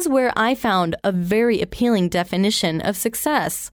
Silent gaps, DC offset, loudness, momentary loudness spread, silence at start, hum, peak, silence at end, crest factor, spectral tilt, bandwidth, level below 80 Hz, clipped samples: none; under 0.1%; -20 LUFS; 4 LU; 0 s; none; -4 dBFS; 0.05 s; 14 dB; -4.5 dB/octave; over 20 kHz; -48 dBFS; under 0.1%